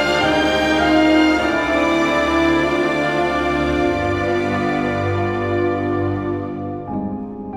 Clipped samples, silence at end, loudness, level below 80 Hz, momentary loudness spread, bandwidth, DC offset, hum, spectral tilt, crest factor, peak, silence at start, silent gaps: under 0.1%; 0 s; -18 LUFS; -38 dBFS; 11 LU; 13.5 kHz; under 0.1%; none; -5.5 dB/octave; 14 dB; -4 dBFS; 0 s; none